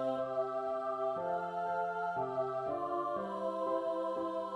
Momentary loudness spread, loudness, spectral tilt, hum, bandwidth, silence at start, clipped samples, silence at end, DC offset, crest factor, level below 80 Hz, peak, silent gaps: 2 LU; -36 LUFS; -7 dB/octave; none; 10 kHz; 0 s; under 0.1%; 0 s; under 0.1%; 12 dB; -74 dBFS; -24 dBFS; none